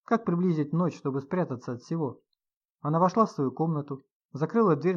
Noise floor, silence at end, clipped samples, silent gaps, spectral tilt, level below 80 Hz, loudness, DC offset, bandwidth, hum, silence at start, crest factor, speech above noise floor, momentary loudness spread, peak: -84 dBFS; 0 s; under 0.1%; 2.56-2.61 s, 2.70-2.75 s, 4.12-4.29 s; -9 dB/octave; -78 dBFS; -28 LUFS; under 0.1%; 7.2 kHz; none; 0.1 s; 18 dB; 57 dB; 12 LU; -10 dBFS